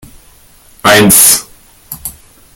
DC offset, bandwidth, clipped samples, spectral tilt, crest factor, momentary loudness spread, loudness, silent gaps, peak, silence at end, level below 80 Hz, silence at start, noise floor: under 0.1%; over 20 kHz; 1%; -2 dB/octave; 12 dB; 22 LU; -5 LUFS; none; 0 dBFS; 0.45 s; -40 dBFS; 0.85 s; -42 dBFS